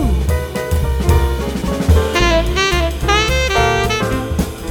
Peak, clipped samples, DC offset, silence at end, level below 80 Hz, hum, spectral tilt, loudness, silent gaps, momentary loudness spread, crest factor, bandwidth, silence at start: 0 dBFS; under 0.1%; under 0.1%; 0 s; -18 dBFS; none; -5 dB/octave; -16 LUFS; none; 6 LU; 14 dB; 18.5 kHz; 0 s